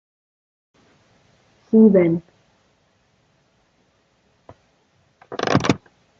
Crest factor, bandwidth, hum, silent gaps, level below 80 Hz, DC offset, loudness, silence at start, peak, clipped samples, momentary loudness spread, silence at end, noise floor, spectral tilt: 22 dB; 7.6 kHz; none; none; -60 dBFS; under 0.1%; -18 LUFS; 1.75 s; 0 dBFS; under 0.1%; 14 LU; 0.4 s; -63 dBFS; -7 dB/octave